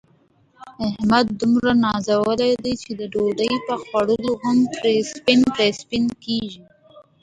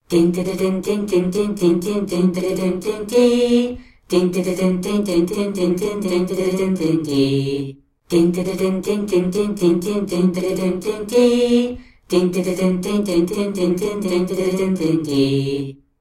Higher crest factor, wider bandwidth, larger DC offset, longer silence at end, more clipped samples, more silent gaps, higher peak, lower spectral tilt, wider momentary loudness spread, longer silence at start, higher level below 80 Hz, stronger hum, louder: about the same, 18 dB vs 14 dB; second, 9.4 kHz vs 15.5 kHz; neither; about the same, 0.2 s vs 0.25 s; neither; neither; about the same, -2 dBFS vs -4 dBFS; second, -5 dB/octave vs -6.5 dB/octave; first, 9 LU vs 5 LU; first, 0.6 s vs 0.1 s; second, -52 dBFS vs -46 dBFS; neither; about the same, -20 LUFS vs -19 LUFS